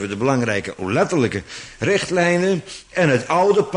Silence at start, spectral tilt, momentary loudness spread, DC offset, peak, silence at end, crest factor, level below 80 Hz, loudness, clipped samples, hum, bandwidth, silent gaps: 0 s; -5.5 dB/octave; 8 LU; under 0.1%; -2 dBFS; 0 s; 16 dB; -52 dBFS; -19 LUFS; under 0.1%; none; 10 kHz; none